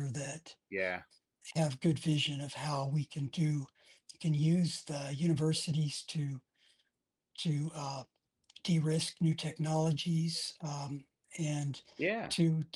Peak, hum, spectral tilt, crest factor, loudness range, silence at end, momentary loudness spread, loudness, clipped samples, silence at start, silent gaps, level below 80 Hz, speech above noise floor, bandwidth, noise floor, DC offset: -18 dBFS; none; -5.5 dB/octave; 16 dB; 3 LU; 0.1 s; 11 LU; -35 LUFS; under 0.1%; 0 s; none; -74 dBFS; 52 dB; 12 kHz; -86 dBFS; under 0.1%